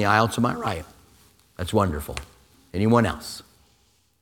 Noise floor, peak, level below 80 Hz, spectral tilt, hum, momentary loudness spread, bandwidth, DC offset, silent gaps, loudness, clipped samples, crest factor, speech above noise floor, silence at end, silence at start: -63 dBFS; -2 dBFS; -44 dBFS; -6 dB/octave; none; 17 LU; 18.5 kHz; under 0.1%; none; -24 LUFS; under 0.1%; 22 dB; 41 dB; 0.8 s; 0 s